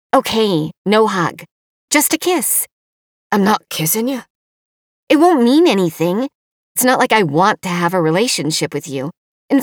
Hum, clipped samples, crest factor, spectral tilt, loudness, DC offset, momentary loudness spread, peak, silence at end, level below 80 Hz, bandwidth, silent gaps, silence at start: none; under 0.1%; 16 dB; -4 dB/octave; -15 LUFS; under 0.1%; 11 LU; 0 dBFS; 0 s; -60 dBFS; over 20 kHz; 0.77-0.85 s, 1.51-1.88 s, 2.72-3.30 s, 4.30-5.07 s, 6.35-6.75 s, 9.17-9.49 s; 0.15 s